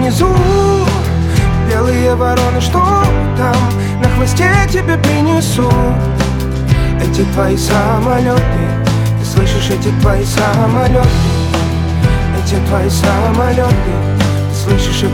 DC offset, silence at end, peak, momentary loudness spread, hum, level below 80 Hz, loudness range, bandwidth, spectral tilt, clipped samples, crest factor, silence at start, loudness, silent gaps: under 0.1%; 0 s; 0 dBFS; 3 LU; none; -20 dBFS; 1 LU; 17 kHz; -6 dB/octave; under 0.1%; 12 dB; 0 s; -12 LUFS; none